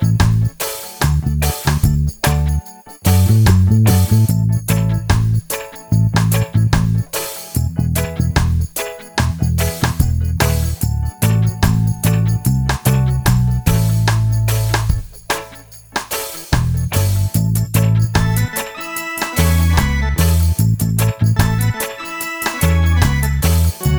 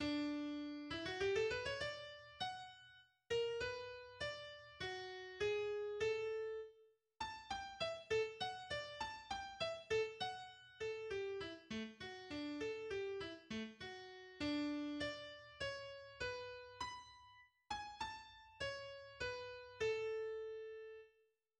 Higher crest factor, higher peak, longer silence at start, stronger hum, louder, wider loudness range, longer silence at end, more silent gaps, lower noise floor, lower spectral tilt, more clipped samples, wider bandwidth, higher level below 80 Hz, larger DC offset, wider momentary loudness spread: about the same, 14 dB vs 18 dB; first, 0 dBFS vs -28 dBFS; about the same, 0 s vs 0 s; neither; first, -16 LUFS vs -45 LUFS; about the same, 4 LU vs 5 LU; second, 0 s vs 0.5 s; neither; second, -38 dBFS vs -79 dBFS; first, -5.5 dB/octave vs -4 dB/octave; neither; first, over 20 kHz vs 10.5 kHz; first, -24 dBFS vs -70 dBFS; first, 0.1% vs under 0.1%; second, 8 LU vs 13 LU